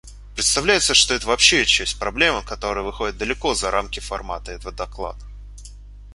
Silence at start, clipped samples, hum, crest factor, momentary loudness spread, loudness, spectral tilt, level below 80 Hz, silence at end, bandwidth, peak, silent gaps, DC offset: 0.05 s; under 0.1%; 50 Hz at -35 dBFS; 22 dB; 17 LU; -18 LUFS; -1 dB/octave; -36 dBFS; 0 s; 11.5 kHz; 0 dBFS; none; under 0.1%